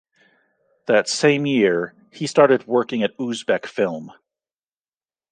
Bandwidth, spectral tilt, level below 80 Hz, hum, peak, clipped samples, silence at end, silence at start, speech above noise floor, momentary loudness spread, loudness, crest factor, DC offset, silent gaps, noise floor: 9.8 kHz; -4.5 dB/octave; -70 dBFS; none; -2 dBFS; under 0.1%; 1.2 s; 0.9 s; over 71 dB; 12 LU; -20 LUFS; 20 dB; under 0.1%; none; under -90 dBFS